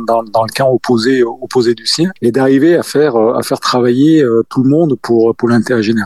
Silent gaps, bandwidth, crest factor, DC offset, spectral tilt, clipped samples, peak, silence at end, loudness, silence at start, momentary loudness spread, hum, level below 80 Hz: none; 13.5 kHz; 10 dB; 0.4%; -5.5 dB/octave; under 0.1%; 0 dBFS; 0 s; -12 LUFS; 0 s; 5 LU; none; -60 dBFS